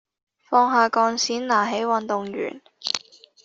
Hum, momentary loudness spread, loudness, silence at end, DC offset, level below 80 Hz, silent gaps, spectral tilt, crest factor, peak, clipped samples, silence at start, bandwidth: none; 12 LU; -22 LUFS; 0.45 s; under 0.1%; -72 dBFS; none; -2.5 dB/octave; 20 dB; -4 dBFS; under 0.1%; 0.5 s; 8 kHz